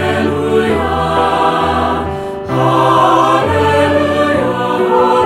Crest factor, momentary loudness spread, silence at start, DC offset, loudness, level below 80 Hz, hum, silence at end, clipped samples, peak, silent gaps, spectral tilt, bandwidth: 12 dB; 6 LU; 0 s; under 0.1%; -12 LUFS; -36 dBFS; none; 0 s; under 0.1%; 0 dBFS; none; -6 dB/octave; 16 kHz